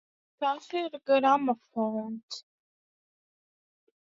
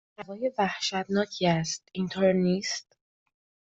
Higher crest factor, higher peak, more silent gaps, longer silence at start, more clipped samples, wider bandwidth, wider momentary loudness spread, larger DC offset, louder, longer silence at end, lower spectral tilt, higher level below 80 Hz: about the same, 22 dB vs 18 dB; about the same, -10 dBFS vs -12 dBFS; first, 2.23-2.28 s vs none; first, 0.4 s vs 0.2 s; neither; about the same, 7.6 kHz vs 8 kHz; first, 16 LU vs 9 LU; neither; about the same, -29 LUFS vs -28 LUFS; first, 1.75 s vs 0.85 s; about the same, -5 dB/octave vs -5 dB/octave; second, -80 dBFS vs -64 dBFS